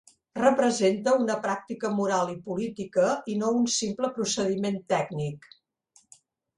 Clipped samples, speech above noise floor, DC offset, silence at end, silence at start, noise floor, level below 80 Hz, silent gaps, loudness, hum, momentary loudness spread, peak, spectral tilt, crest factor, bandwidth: under 0.1%; 38 dB; under 0.1%; 1.2 s; 0.35 s; -64 dBFS; -68 dBFS; none; -27 LUFS; none; 9 LU; -8 dBFS; -4.5 dB/octave; 20 dB; 11.5 kHz